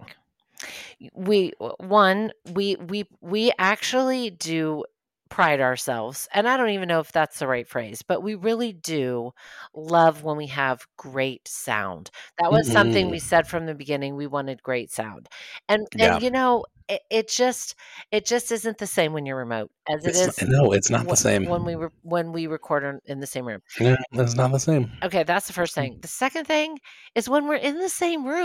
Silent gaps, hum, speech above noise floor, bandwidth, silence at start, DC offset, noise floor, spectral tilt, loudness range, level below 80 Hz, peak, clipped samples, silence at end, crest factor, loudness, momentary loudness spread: none; none; 30 dB; 16.5 kHz; 0 s; under 0.1%; -54 dBFS; -4.5 dB/octave; 3 LU; -56 dBFS; -4 dBFS; under 0.1%; 0 s; 20 dB; -23 LUFS; 14 LU